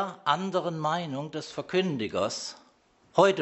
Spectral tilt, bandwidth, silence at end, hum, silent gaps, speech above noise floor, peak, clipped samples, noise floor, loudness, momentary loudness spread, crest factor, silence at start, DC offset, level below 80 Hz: -5 dB/octave; 8.2 kHz; 0 s; none; none; 33 dB; -6 dBFS; under 0.1%; -63 dBFS; -29 LUFS; 11 LU; 22 dB; 0 s; under 0.1%; -70 dBFS